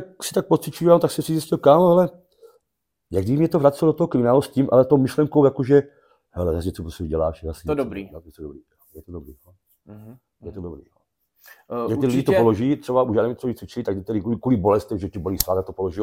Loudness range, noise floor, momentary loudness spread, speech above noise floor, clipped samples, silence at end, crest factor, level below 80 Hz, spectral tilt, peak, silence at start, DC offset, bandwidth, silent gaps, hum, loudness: 15 LU; -79 dBFS; 21 LU; 59 dB; under 0.1%; 0 s; 20 dB; -46 dBFS; -7 dB/octave; 0 dBFS; 0 s; under 0.1%; 17 kHz; none; none; -20 LUFS